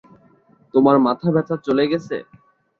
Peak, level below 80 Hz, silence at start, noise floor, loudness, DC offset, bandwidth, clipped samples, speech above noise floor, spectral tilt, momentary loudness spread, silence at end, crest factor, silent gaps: -2 dBFS; -62 dBFS; 0.75 s; -55 dBFS; -18 LUFS; under 0.1%; 6.8 kHz; under 0.1%; 37 dB; -8.5 dB/octave; 11 LU; 0.6 s; 18 dB; none